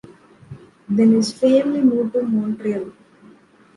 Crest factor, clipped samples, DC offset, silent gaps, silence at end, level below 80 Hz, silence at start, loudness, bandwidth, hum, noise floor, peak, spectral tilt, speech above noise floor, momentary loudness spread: 16 dB; under 0.1%; under 0.1%; none; 0.85 s; -62 dBFS; 0.5 s; -18 LUFS; 11.5 kHz; none; -49 dBFS; -4 dBFS; -6.5 dB/octave; 32 dB; 10 LU